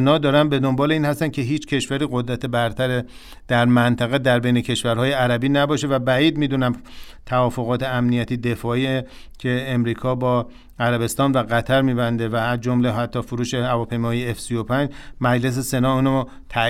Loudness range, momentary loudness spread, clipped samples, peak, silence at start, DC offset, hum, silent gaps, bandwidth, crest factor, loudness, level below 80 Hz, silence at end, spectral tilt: 3 LU; 7 LU; under 0.1%; -4 dBFS; 0 s; under 0.1%; none; none; 15.5 kHz; 16 dB; -20 LUFS; -44 dBFS; 0 s; -6 dB/octave